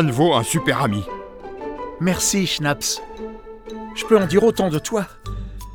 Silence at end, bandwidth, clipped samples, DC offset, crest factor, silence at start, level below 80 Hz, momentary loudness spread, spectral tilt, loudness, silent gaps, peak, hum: 0 s; over 20 kHz; under 0.1%; under 0.1%; 20 dB; 0 s; -40 dBFS; 18 LU; -4.5 dB/octave; -20 LUFS; none; -2 dBFS; none